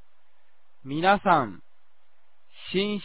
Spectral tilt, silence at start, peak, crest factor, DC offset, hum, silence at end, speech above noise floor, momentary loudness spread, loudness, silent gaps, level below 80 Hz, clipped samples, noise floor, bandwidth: -9 dB/octave; 0.85 s; -6 dBFS; 22 dB; 0.8%; none; 0 s; 47 dB; 20 LU; -24 LUFS; none; -60 dBFS; under 0.1%; -70 dBFS; 4 kHz